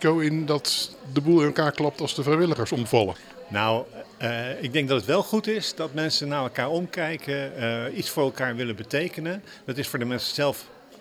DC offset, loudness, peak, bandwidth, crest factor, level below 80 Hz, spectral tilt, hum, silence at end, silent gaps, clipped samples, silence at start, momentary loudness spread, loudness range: under 0.1%; -25 LUFS; -4 dBFS; 17.5 kHz; 22 dB; -64 dBFS; -5 dB/octave; none; 0.05 s; none; under 0.1%; 0 s; 8 LU; 4 LU